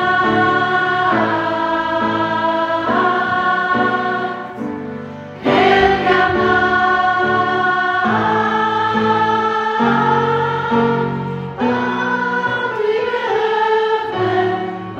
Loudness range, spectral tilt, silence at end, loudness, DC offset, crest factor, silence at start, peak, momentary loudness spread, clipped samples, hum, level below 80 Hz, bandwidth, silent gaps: 3 LU; -6 dB/octave; 0 s; -16 LUFS; under 0.1%; 16 dB; 0 s; 0 dBFS; 7 LU; under 0.1%; none; -46 dBFS; 8.4 kHz; none